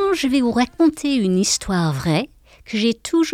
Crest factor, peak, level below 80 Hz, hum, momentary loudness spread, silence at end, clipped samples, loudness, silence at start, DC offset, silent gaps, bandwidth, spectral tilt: 14 dB; -6 dBFS; -46 dBFS; none; 4 LU; 0 s; under 0.1%; -19 LUFS; 0 s; under 0.1%; none; 15.5 kHz; -4.5 dB/octave